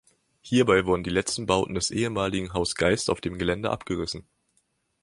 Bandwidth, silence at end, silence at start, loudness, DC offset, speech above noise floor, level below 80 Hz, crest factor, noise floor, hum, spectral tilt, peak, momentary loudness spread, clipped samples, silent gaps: 11.5 kHz; 0.8 s; 0.45 s; -25 LUFS; under 0.1%; 46 dB; -48 dBFS; 22 dB; -71 dBFS; none; -4.5 dB/octave; -4 dBFS; 8 LU; under 0.1%; none